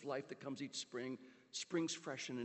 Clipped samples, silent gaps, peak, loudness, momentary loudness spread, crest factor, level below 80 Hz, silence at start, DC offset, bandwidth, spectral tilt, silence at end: under 0.1%; none; -28 dBFS; -45 LUFS; 8 LU; 18 dB; under -90 dBFS; 0 s; under 0.1%; 8.4 kHz; -3.5 dB/octave; 0 s